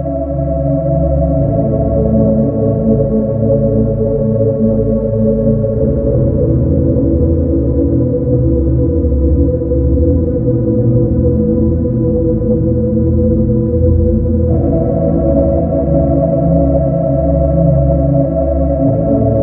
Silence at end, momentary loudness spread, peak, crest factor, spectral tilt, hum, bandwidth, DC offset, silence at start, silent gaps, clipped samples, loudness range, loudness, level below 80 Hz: 0 s; 2 LU; 0 dBFS; 12 dB; -16 dB/octave; none; 2.1 kHz; under 0.1%; 0 s; none; under 0.1%; 1 LU; -13 LUFS; -20 dBFS